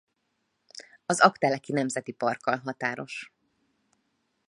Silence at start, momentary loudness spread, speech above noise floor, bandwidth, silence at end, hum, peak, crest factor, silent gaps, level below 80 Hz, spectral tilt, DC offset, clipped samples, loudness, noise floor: 0.75 s; 21 LU; 50 dB; 11.5 kHz; 1.25 s; none; -2 dBFS; 28 dB; none; -76 dBFS; -4 dB/octave; under 0.1%; under 0.1%; -27 LUFS; -77 dBFS